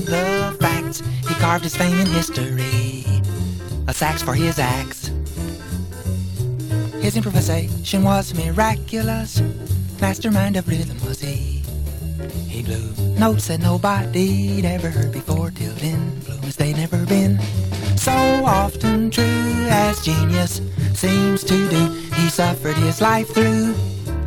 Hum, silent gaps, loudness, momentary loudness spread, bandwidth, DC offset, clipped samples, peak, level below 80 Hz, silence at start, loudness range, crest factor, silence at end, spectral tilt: none; none; -20 LUFS; 9 LU; 19 kHz; under 0.1%; under 0.1%; 0 dBFS; -34 dBFS; 0 s; 5 LU; 18 dB; 0 s; -5.5 dB/octave